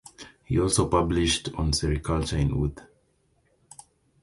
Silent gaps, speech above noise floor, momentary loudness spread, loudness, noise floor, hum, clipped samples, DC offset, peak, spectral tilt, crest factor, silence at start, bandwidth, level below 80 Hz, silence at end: none; 43 dB; 8 LU; -25 LUFS; -67 dBFS; none; under 0.1%; under 0.1%; -8 dBFS; -5 dB/octave; 20 dB; 0.2 s; 11.5 kHz; -36 dBFS; 1.4 s